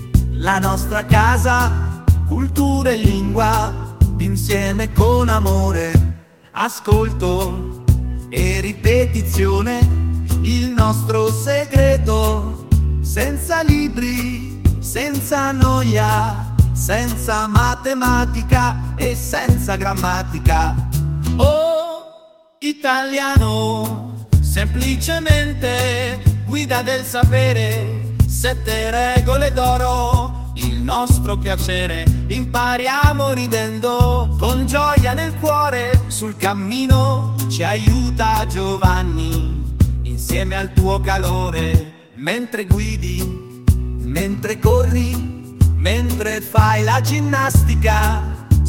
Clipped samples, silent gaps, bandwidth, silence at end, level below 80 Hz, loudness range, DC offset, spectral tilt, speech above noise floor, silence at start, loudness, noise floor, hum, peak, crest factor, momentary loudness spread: under 0.1%; none; 17 kHz; 0 s; -22 dBFS; 2 LU; 0.1%; -5.5 dB/octave; 30 dB; 0 s; -17 LUFS; -46 dBFS; none; 0 dBFS; 16 dB; 7 LU